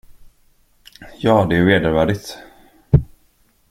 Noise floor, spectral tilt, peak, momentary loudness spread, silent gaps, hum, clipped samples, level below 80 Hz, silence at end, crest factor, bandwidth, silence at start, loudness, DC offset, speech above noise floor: -58 dBFS; -7 dB/octave; -2 dBFS; 20 LU; none; none; under 0.1%; -36 dBFS; 0.65 s; 18 dB; 16 kHz; 1 s; -17 LUFS; under 0.1%; 42 dB